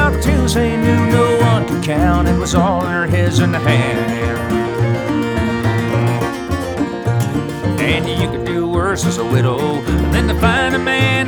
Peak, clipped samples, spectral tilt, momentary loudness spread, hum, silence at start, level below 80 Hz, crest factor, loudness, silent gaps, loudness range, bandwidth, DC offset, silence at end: 0 dBFS; under 0.1%; -6 dB/octave; 5 LU; none; 0 s; -26 dBFS; 14 dB; -16 LUFS; none; 3 LU; over 20 kHz; under 0.1%; 0 s